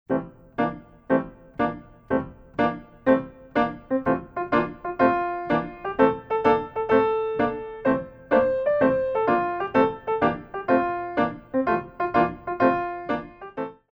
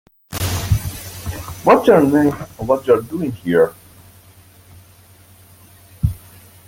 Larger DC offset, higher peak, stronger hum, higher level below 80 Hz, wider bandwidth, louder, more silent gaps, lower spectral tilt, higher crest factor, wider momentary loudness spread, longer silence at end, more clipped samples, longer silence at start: neither; second, -6 dBFS vs 0 dBFS; second, none vs 50 Hz at -50 dBFS; second, -52 dBFS vs -38 dBFS; second, 5.8 kHz vs 17 kHz; second, -24 LUFS vs -17 LUFS; neither; first, -8.5 dB/octave vs -6.5 dB/octave; about the same, 18 dB vs 18 dB; second, 9 LU vs 17 LU; second, 0.2 s vs 0.5 s; neither; second, 0.1 s vs 0.3 s